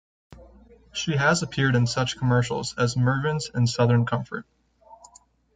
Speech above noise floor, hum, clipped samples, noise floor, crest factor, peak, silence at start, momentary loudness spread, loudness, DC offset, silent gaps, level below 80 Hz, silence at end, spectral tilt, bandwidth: 33 dB; none; under 0.1%; -56 dBFS; 18 dB; -6 dBFS; 0.3 s; 9 LU; -24 LUFS; under 0.1%; none; -54 dBFS; 0.6 s; -5.5 dB/octave; 9.4 kHz